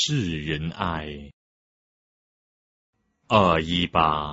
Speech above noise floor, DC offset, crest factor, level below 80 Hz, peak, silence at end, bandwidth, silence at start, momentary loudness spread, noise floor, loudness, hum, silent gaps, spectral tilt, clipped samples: over 67 dB; under 0.1%; 22 dB; -46 dBFS; -4 dBFS; 0 s; 8 kHz; 0 s; 13 LU; under -90 dBFS; -23 LUFS; none; 1.33-2.93 s; -5 dB/octave; under 0.1%